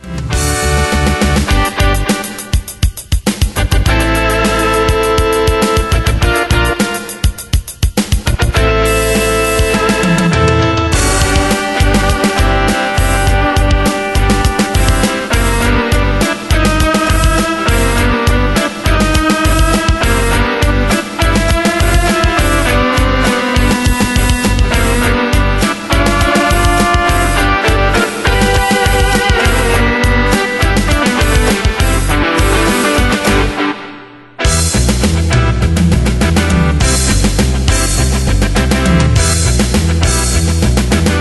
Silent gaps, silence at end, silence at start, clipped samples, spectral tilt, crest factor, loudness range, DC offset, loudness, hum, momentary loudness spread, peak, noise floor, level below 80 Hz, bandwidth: none; 0 s; 0.05 s; under 0.1%; -4.5 dB/octave; 12 dB; 2 LU; under 0.1%; -12 LUFS; none; 3 LU; 0 dBFS; -33 dBFS; -16 dBFS; 12.5 kHz